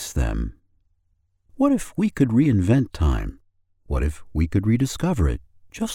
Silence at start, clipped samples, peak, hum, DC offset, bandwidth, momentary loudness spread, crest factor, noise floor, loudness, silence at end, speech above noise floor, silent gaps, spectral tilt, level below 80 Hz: 0 s; under 0.1%; -4 dBFS; none; under 0.1%; 16.5 kHz; 12 LU; 18 dB; -67 dBFS; -22 LUFS; 0 s; 46 dB; none; -7 dB/octave; -30 dBFS